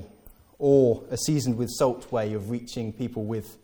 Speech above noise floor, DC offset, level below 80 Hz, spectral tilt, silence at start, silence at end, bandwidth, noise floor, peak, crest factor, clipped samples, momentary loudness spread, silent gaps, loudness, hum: 27 dB; under 0.1%; -56 dBFS; -6 dB/octave; 0 s; 0.1 s; 18 kHz; -52 dBFS; -8 dBFS; 18 dB; under 0.1%; 12 LU; none; -26 LUFS; none